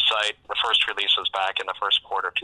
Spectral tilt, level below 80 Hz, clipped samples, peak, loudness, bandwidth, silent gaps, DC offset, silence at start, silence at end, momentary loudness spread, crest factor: 0.5 dB/octave; -62 dBFS; under 0.1%; -8 dBFS; -22 LUFS; 12 kHz; none; under 0.1%; 0 s; 0 s; 6 LU; 16 dB